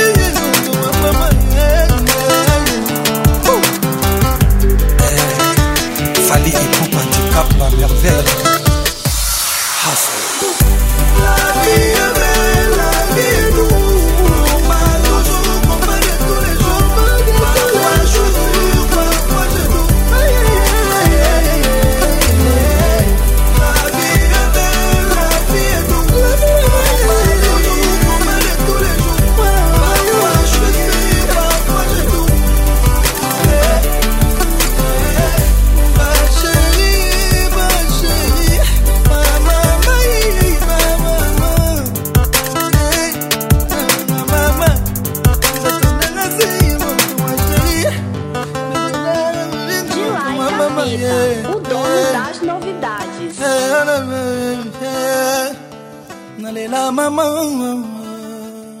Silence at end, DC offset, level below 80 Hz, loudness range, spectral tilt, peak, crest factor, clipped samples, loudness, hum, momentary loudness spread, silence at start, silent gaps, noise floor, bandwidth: 0 s; under 0.1%; -14 dBFS; 5 LU; -4 dB/octave; 0 dBFS; 12 dB; under 0.1%; -13 LUFS; none; 6 LU; 0 s; none; -33 dBFS; 16.5 kHz